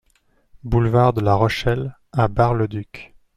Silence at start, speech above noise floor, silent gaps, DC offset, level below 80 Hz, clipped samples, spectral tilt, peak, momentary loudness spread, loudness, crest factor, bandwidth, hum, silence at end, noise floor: 0.65 s; 43 dB; none; under 0.1%; -36 dBFS; under 0.1%; -8 dB/octave; -4 dBFS; 17 LU; -19 LUFS; 16 dB; 10.5 kHz; none; 0.3 s; -61 dBFS